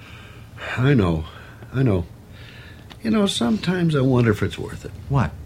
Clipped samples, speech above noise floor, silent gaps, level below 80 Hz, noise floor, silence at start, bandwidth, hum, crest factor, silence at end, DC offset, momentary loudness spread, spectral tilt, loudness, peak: under 0.1%; 21 dB; none; -44 dBFS; -41 dBFS; 0 s; 15.5 kHz; none; 18 dB; 0 s; under 0.1%; 23 LU; -6.5 dB/octave; -21 LUFS; -4 dBFS